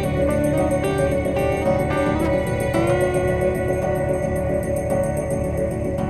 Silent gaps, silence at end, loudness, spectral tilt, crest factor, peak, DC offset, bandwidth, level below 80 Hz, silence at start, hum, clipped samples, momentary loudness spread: none; 0 s; -21 LUFS; -7 dB/octave; 14 dB; -6 dBFS; under 0.1%; 12.5 kHz; -32 dBFS; 0 s; none; under 0.1%; 3 LU